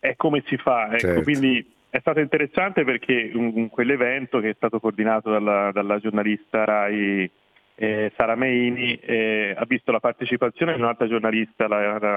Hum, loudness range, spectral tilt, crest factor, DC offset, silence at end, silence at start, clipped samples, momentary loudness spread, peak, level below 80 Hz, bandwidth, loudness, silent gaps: none; 1 LU; -7 dB/octave; 22 dB; under 0.1%; 0 s; 0.05 s; under 0.1%; 4 LU; 0 dBFS; -58 dBFS; 12 kHz; -22 LUFS; none